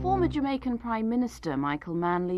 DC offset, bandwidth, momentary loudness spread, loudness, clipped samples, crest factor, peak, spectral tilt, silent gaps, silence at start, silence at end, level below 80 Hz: under 0.1%; 12.5 kHz; 5 LU; -29 LUFS; under 0.1%; 14 dB; -14 dBFS; -7.5 dB/octave; none; 0 s; 0 s; -46 dBFS